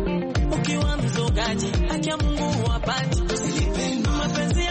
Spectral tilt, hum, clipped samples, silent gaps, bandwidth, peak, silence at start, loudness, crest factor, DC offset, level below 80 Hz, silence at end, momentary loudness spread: -5 dB/octave; none; under 0.1%; none; 8.8 kHz; -12 dBFS; 0 s; -24 LUFS; 10 dB; under 0.1%; -28 dBFS; 0 s; 1 LU